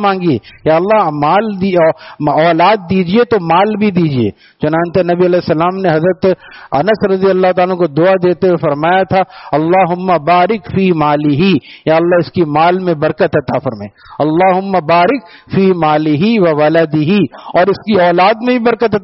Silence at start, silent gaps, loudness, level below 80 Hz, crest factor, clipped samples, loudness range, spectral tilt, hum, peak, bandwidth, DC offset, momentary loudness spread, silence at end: 0 s; none; -12 LUFS; -48 dBFS; 12 dB; under 0.1%; 2 LU; -5.5 dB/octave; none; 0 dBFS; 5.8 kHz; under 0.1%; 5 LU; 0 s